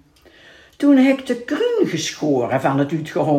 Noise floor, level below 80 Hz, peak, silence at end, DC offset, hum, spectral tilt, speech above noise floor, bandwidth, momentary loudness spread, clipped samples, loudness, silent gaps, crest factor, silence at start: -49 dBFS; -62 dBFS; -4 dBFS; 0 s; under 0.1%; none; -5.5 dB/octave; 31 dB; 14.5 kHz; 8 LU; under 0.1%; -18 LUFS; none; 14 dB; 0.8 s